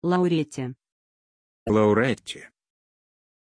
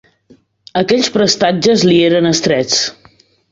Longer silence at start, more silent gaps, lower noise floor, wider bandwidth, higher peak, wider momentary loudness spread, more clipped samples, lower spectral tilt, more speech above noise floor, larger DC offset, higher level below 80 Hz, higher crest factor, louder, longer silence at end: second, 0 s vs 0.75 s; first, 0.92-1.66 s vs none; first, under -90 dBFS vs -49 dBFS; first, 11 kHz vs 8 kHz; second, -8 dBFS vs 0 dBFS; first, 17 LU vs 7 LU; neither; first, -6.5 dB/octave vs -4 dB/octave; first, over 67 dB vs 37 dB; neither; second, -58 dBFS vs -52 dBFS; about the same, 18 dB vs 14 dB; second, -23 LUFS vs -12 LUFS; first, 0.95 s vs 0.6 s